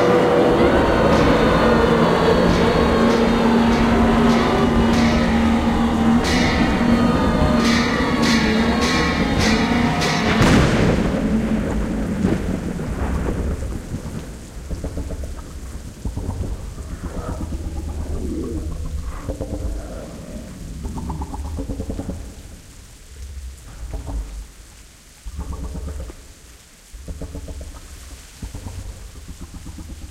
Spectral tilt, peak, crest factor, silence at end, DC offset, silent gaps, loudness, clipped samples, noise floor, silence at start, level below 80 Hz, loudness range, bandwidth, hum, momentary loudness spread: -6 dB/octave; -4 dBFS; 16 dB; 0 s; under 0.1%; none; -18 LUFS; under 0.1%; -44 dBFS; 0 s; -28 dBFS; 19 LU; 15 kHz; none; 21 LU